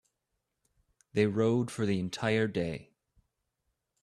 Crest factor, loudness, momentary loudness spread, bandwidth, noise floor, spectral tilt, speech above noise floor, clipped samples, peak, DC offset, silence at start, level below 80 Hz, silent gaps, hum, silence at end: 20 dB; -31 LUFS; 9 LU; 13 kHz; -84 dBFS; -6.5 dB/octave; 54 dB; under 0.1%; -14 dBFS; under 0.1%; 1.15 s; -66 dBFS; none; none; 1.2 s